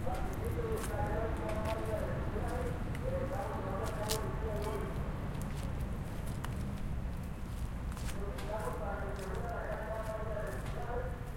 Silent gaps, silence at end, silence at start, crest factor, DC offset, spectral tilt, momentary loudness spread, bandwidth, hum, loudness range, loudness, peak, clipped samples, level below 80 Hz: none; 0 s; 0 s; 20 dB; under 0.1%; -6 dB/octave; 5 LU; 16.5 kHz; none; 3 LU; -39 LUFS; -18 dBFS; under 0.1%; -42 dBFS